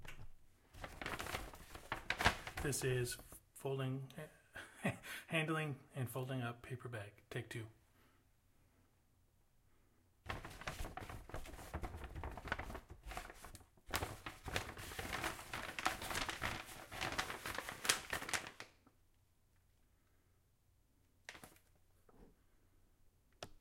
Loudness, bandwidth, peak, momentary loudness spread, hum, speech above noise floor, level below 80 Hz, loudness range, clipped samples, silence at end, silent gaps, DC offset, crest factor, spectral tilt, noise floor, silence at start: -44 LUFS; 16.5 kHz; -10 dBFS; 18 LU; none; 32 dB; -58 dBFS; 20 LU; under 0.1%; 0 s; none; under 0.1%; 36 dB; -3.5 dB/octave; -75 dBFS; 0 s